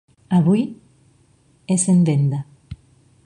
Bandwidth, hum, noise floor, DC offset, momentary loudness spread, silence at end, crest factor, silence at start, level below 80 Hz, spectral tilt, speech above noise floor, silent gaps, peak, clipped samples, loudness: 11 kHz; none; -57 dBFS; under 0.1%; 25 LU; 0.5 s; 16 dB; 0.3 s; -52 dBFS; -7 dB/octave; 40 dB; none; -6 dBFS; under 0.1%; -19 LUFS